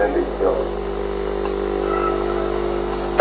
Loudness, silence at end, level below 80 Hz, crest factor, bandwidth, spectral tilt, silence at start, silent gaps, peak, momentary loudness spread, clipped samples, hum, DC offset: -22 LUFS; 0 s; -32 dBFS; 20 dB; 4.7 kHz; -10.5 dB/octave; 0 s; none; 0 dBFS; 4 LU; under 0.1%; 50 Hz at -30 dBFS; under 0.1%